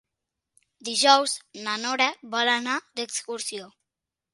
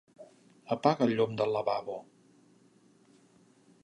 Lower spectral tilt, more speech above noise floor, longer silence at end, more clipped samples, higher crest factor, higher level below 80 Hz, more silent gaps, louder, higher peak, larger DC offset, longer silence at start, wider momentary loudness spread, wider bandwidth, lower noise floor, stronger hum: second, 0 dB/octave vs -7 dB/octave; first, 62 dB vs 34 dB; second, 0.65 s vs 1.8 s; neither; about the same, 26 dB vs 24 dB; second, -82 dBFS vs -76 dBFS; neither; first, -24 LUFS vs -30 LUFS; first, -2 dBFS vs -10 dBFS; neither; first, 0.85 s vs 0.2 s; about the same, 13 LU vs 13 LU; about the same, 11.5 kHz vs 10.5 kHz; first, -87 dBFS vs -63 dBFS; neither